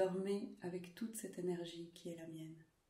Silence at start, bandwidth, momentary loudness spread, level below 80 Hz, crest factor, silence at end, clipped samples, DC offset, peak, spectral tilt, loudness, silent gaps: 0 s; 16 kHz; 10 LU; -82 dBFS; 20 dB; 0.25 s; under 0.1%; under 0.1%; -26 dBFS; -5.5 dB/octave; -46 LUFS; none